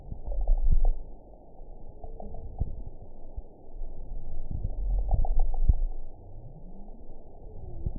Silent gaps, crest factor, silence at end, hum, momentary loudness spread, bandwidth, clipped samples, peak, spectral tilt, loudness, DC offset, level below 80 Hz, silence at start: none; 16 dB; 0 s; none; 20 LU; 1 kHz; under 0.1%; -10 dBFS; -15.5 dB/octave; -35 LUFS; 0.2%; -28 dBFS; 0 s